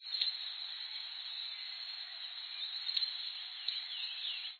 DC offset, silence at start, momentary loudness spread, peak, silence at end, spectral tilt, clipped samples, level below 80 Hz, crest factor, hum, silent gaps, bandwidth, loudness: under 0.1%; 0 s; 7 LU; -16 dBFS; 0 s; 6.5 dB/octave; under 0.1%; under -90 dBFS; 26 dB; none; none; 4.7 kHz; -38 LUFS